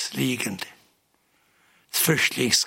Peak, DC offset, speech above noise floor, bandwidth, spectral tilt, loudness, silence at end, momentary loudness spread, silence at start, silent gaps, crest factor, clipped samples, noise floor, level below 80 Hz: -4 dBFS; under 0.1%; 43 dB; 16.5 kHz; -2.5 dB/octave; -23 LUFS; 0 s; 14 LU; 0 s; none; 22 dB; under 0.1%; -67 dBFS; -68 dBFS